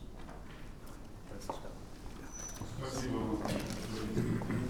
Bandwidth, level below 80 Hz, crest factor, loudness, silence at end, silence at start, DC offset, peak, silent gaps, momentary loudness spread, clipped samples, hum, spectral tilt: over 20 kHz; -48 dBFS; 20 dB; -40 LUFS; 0 s; 0 s; under 0.1%; -20 dBFS; none; 15 LU; under 0.1%; none; -5.5 dB/octave